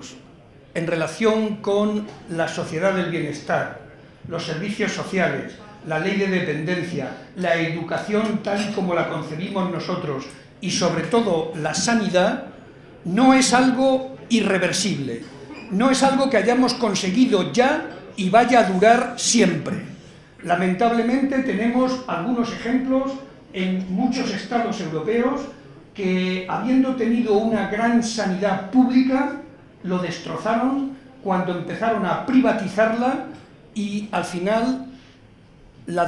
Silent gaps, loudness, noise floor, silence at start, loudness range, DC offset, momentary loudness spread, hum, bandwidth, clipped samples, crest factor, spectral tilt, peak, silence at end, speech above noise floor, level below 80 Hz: none; -21 LUFS; -49 dBFS; 0 s; 6 LU; under 0.1%; 13 LU; none; 12 kHz; under 0.1%; 20 dB; -5 dB/octave; -2 dBFS; 0 s; 28 dB; -56 dBFS